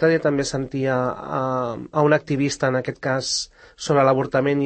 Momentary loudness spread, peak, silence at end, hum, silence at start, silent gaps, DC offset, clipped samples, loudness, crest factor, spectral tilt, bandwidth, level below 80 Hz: 7 LU; -4 dBFS; 0 s; none; 0 s; none; under 0.1%; under 0.1%; -21 LUFS; 16 dB; -5 dB/octave; 8.8 kHz; -54 dBFS